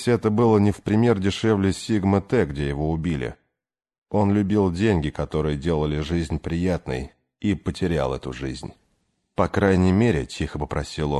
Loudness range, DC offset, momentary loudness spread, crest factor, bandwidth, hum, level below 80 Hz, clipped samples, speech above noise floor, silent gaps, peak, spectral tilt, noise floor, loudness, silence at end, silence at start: 5 LU; under 0.1%; 11 LU; 18 dB; 12 kHz; none; -38 dBFS; under 0.1%; 63 dB; 3.98-4.02 s; -6 dBFS; -7 dB/octave; -85 dBFS; -23 LUFS; 0 s; 0 s